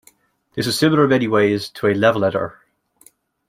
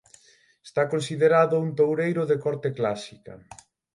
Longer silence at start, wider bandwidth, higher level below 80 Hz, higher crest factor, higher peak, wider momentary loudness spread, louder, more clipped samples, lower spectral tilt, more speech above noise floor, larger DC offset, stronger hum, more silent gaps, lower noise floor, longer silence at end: about the same, 0.55 s vs 0.65 s; first, 16 kHz vs 11.5 kHz; first, -58 dBFS vs -68 dBFS; about the same, 18 dB vs 18 dB; first, -2 dBFS vs -8 dBFS; second, 10 LU vs 13 LU; first, -17 LUFS vs -24 LUFS; neither; about the same, -5.5 dB/octave vs -6.5 dB/octave; about the same, 38 dB vs 36 dB; neither; neither; neither; second, -55 dBFS vs -59 dBFS; first, 1 s vs 0.6 s